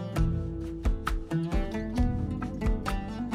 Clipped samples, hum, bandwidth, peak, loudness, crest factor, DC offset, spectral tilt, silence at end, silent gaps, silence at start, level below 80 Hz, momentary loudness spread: under 0.1%; none; 13.5 kHz; -14 dBFS; -32 LUFS; 14 dB; under 0.1%; -7.5 dB/octave; 0 s; none; 0 s; -32 dBFS; 4 LU